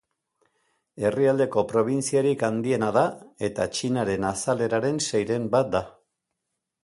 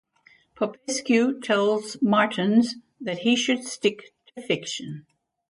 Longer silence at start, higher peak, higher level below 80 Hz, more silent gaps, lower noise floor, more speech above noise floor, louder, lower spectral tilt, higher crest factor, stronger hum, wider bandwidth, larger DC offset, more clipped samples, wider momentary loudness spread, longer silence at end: first, 0.95 s vs 0.6 s; about the same, -8 dBFS vs -6 dBFS; first, -58 dBFS vs -72 dBFS; neither; first, -82 dBFS vs -59 dBFS; first, 58 dB vs 35 dB; about the same, -25 LUFS vs -24 LUFS; about the same, -5 dB/octave vs -4 dB/octave; about the same, 18 dB vs 18 dB; neither; about the same, 11.5 kHz vs 11.5 kHz; neither; neither; second, 6 LU vs 15 LU; first, 0.95 s vs 0.5 s